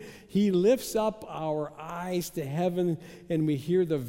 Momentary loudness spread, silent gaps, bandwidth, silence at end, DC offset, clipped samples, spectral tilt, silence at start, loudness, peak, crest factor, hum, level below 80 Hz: 10 LU; none; 16.5 kHz; 0 s; under 0.1%; under 0.1%; -6.5 dB/octave; 0 s; -29 LUFS; -14 dBFS; 14 dB; none; -60 dBFS